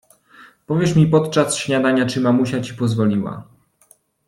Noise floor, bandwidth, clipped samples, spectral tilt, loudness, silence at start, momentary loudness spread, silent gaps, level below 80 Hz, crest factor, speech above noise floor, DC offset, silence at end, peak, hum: -56 dBFS; 13 kHz; under 0.1%; -6 dB/octave; -18 LUFS; 0.4 s; 9 LU; none; -54 dBFS; 16 dB; 38 dB; under 0.1%; 0.85 s; -2 dBFS; none